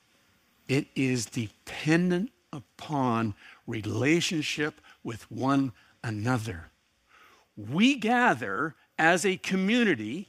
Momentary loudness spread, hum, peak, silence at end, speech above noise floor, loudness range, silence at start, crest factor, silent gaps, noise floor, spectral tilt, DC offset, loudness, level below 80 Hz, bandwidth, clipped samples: 16 LU; none; -6 dBFS; 0.05 s; 38 dB; 4 LU; 0.7 s; 22 dB; none; -66 dBFS; -5 dB/octave; under 0.1%; -27 LUFS; -64 dBFS; 15.5 kHz; under 0.1%